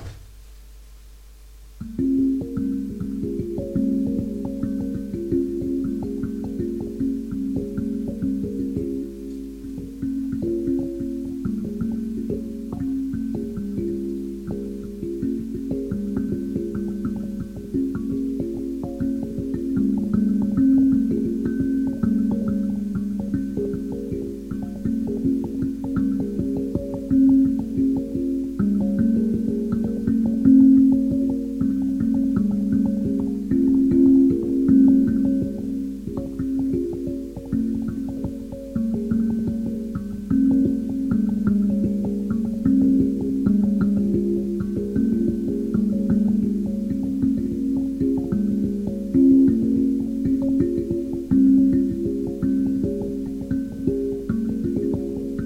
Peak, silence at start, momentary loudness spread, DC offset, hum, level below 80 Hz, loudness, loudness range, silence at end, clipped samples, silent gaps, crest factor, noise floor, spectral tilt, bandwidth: -6 dBFS; 0 s; 11 LU; under 0.1%; none; -42 dBFS; -23 LUFS; 9 LU; 0 s; under 0.1%; none; 16 dB; -44 dBFS; -9.5 dB/octave; 7.6 kHz